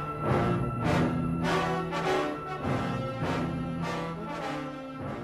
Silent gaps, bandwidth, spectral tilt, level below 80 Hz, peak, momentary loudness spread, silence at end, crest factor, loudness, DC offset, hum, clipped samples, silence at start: none; 13.5 kHz; -6.5 dB/octave; -50 dBFS; -14 dBFS; 8 LU; 0 s; 16 dB; -30 LUFS; under 0.1%; none; under 0.1%; 0 s